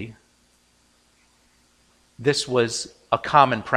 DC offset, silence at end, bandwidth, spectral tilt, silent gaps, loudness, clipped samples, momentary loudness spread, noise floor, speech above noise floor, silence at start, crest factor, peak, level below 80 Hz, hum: under 0.1%; 0 s; 15.5 kHz; -4 dB/octave; none; -21 LUFS; under 0.1%; 11 LU; -61 dBFS; 41 dB; 0 s; 24 dB; -2 dBFS; -60 dBFS; 60 Hz at -60 dBFS